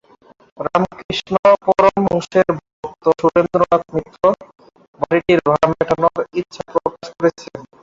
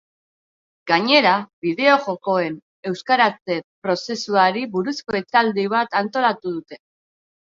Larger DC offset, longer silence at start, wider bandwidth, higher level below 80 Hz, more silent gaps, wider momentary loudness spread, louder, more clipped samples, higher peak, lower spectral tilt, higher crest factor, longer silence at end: neither; second, 0.6 s vs 0.85 s; about the same, 7.8 kHz vs 7.6 kHz; first, -50 dBFS vs -66 dBFS; second, 1.04-1.09 s, 1.39-1.43 s, 2.73-2.83 s, 4.88-4.93 s vs 1.53-1.62 s, 2.62-2.83 s, 3.41-3.45 s, 3.64-3.82 s; about the same, 12 LU vs 12 LU; first, -17 LUFS vs -20 LUFS; neither; about the same, -2 dBFS vs -2 dBFS; first, -6.5 dB/octave vs -4.5 dB/octave; about the same, 16 dB vs 20 dB; second, 0.2 s vs 0.65 s